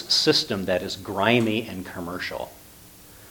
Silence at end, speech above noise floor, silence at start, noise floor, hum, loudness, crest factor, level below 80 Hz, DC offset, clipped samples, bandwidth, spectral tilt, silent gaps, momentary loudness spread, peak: 0 s; 24 dB; 0 s; -48 dBFS; none; -24 LUFS; 22 dB; -56 dBFS; under 0.1%; under 0.1%; 19 kHz; -4 dB/octave; none; 15 LU; -2 dBFS